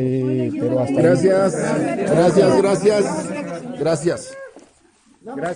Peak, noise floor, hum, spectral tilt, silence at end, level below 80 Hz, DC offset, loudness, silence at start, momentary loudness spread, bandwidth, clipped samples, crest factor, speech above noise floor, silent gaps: -2 dBFS; -55 dBFS; none; -6.5 dB/octave; 0 s; -54 dBFS; under 0.1%; -18 LUFS; 0 s; 13 LU; 10.5 kHz; under 0.1%; 16 dB; 37 dB; none